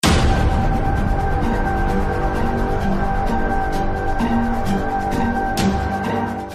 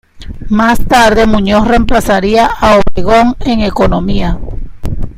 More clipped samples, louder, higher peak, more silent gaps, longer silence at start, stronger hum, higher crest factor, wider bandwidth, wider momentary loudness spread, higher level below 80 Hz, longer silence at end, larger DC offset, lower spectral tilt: second, under 0.1% vs 0.5%; second, -20 LUFS vs -10 LUFS; about the same, -2 dBFS vs 0 dBFS; neither; second, 0.05 s vs 0.2 s; neither; first, 16 dB vs 8 dB; about the same, 15 kHz vs 15.5 kHz; second, 3 LU vs 15 LU; about the same, -22 dBFS vs -20 dBFS; about the same, 0 s vs 0 s; neither; about the same, -6 dB/octave vs -5.5 dB/octave